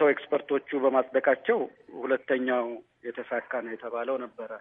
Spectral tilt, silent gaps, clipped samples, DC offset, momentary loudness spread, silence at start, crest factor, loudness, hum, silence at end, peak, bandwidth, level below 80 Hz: -8 dB/octave; none; under 0.1%; under 0.1%; 13 LU; 0 s; 18 dB; -29 LUFS; none; 0 s; -10 dBFS; 3.8 kHz; -82 dBFS